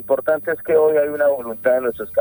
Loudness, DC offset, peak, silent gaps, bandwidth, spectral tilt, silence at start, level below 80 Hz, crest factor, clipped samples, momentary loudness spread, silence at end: -18 LUFS; under 0.1%; -4 dBFS; none; over 20 kHz; -8 dB/octave; 0 s; -56 dBFS; 14 dB; under 0.1%; 6 LU; 0 s